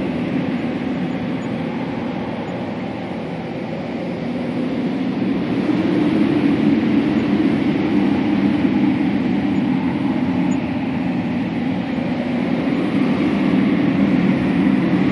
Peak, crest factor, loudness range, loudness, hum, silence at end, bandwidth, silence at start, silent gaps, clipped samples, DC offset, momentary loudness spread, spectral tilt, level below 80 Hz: -4 dBFS; 14 dB; 7 LU; -19 LUFS; none; 0 s; 11 kHz; 0 s; none; under 0.1%; under 0.1%; 9 LU; -8 dB/octave; -50 dBFS